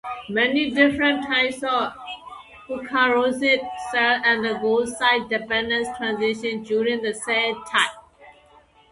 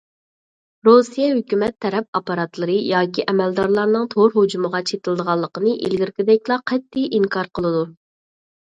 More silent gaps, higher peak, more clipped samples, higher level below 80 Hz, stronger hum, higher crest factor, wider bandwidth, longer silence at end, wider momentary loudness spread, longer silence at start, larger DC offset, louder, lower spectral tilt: second, none vs 2.08-2.13 s; second, -4 dBFS vs 0 dBFS; neither; about the same, -58 dBFS vs -60 dBFS; neither; about the same, 18 dB vs 18 dB; first, 11.5 kHz vs 9.2 kHz; second, 0.6 s vs 0.8 s; about the same, 10 LU vs 8 LU; second, 0.05 s vs 0.85 s; neither; about the same, -21 LUFS vs -19 LUFS; second, -3 dB/octave vs -6 dB/octave